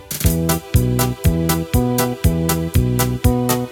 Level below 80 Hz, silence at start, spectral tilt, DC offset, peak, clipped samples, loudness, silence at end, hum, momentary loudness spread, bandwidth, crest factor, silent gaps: -26 dBFS; 0 s; -5.5 dB/octave; under 0.1%; 0 dBFS; under 0.1%; -18 LUFS; 0 s; none; 2 LU; 19 kHz; 16 dB; none